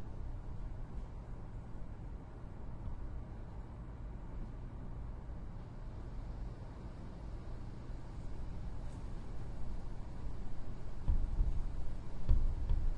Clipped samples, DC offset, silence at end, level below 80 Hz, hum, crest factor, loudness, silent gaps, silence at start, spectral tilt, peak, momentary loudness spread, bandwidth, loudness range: under 0.1%; under 0.1%; 0 s; -40 dBFS; none; 22 dB; -46 LUFS; none; 0 s; -8 dB/octave; -16 dBFS; 10 LU; 5.4 kHz; 7 LU